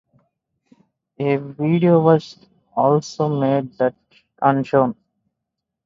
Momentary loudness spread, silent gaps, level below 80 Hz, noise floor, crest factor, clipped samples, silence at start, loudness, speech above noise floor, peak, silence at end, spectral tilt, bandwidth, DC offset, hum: 9 LU; none; -62 dBFS; -81 dBFS; 20 dB; under 0.1%; 1.2 s; -19 LUFS; 63 dB; 0 dBFS; 0.95 s; -8 dB/octave; 7.6 kHz; under 0.1%; none